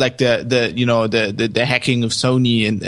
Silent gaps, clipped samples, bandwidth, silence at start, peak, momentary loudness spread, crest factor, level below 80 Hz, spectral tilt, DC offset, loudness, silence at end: none; under 0.1%; 11.5 kHz; 0 s; 0 dBFS; 3 LU; 16 dB; -50 dBFS; -5 dB/octave; under 0.1%; -17 LUFS; 0 s